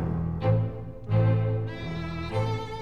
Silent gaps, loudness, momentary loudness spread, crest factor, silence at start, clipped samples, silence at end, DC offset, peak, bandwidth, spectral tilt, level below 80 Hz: none; -28 LUFS; 9 LU; 14 dB; 0 s; under 0.1%; 0 s; 0.5%; -14 dBFS; 6.4 kHz; -8.5 dB/octave; -44 dBFS